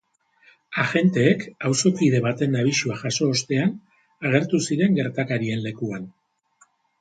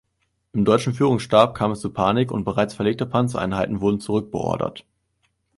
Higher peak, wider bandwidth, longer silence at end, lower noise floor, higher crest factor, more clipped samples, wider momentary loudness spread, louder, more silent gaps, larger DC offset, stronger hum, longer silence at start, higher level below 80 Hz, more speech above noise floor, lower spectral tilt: about the same, -4 dBFS vs -2 dBFS; second, 9.4 kHz vs 11.5 kHz; about the same, 0.9 s vs 0.8 s; second, -61 dBFS vs -72 dBFS; about the same, 18 dB vs 20 dB; neither; first, 11 LU vs 8 LU; about the same, -22 LUFS vs -21 LUFS; neither; neither; neither; first, 0.7 s vs 0.55 s; second, -64 dBFS vs -50 dBFS; second, 39 dB vs 51 dB; second, -5 dB/octave vs -6.5 dB/octave